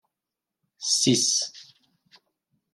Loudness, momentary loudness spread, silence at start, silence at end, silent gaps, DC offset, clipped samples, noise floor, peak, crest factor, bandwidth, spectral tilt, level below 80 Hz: -22 LUFS; 13 LU; 0.8 s; 1.1 s; none; under 0.1%; under 0.1%; -87 dBFS; -10 dBFS; 20 dB; 13.5 kHz; -2.5 dB/octave; -76 dBFS